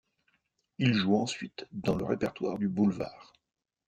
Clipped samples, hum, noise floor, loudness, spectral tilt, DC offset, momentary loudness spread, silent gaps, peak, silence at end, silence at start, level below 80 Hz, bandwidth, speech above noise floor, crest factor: under 0.1%; none; -76 dBFS; -31 LUFS; -6 dB/octave; under 0.1%; 12 LU; none; -12 dBFS; 0.65 s; 0.8 s; -62 dBFS; 9 kHz; 46 dB; 20 dB